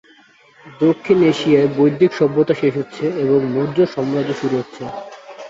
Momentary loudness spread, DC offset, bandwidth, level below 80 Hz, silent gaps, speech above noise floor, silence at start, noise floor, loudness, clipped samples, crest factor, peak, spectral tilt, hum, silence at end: 12 LU; under 0.1%; 7.8 kHz; -58 dBFS; none; 33 dB; 0.65 s; -50 dBFS; -17 LUFS; under 0.1%; 14 dB; -2 dBFS; -7.5 dB/octave; none; 0 s